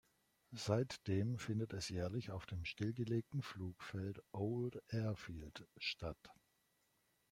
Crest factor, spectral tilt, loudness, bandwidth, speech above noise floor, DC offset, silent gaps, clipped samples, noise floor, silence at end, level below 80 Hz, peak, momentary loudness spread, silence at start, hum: 22 dB; -6 dB/octave; -44 LUFS; 15.5 kHz; 38 dB; under 0.1%; none; under 0.1%; -81 dBFS; 1 s; -68 dBFS; -22 dBFS; 9 LU; 0.5 s; none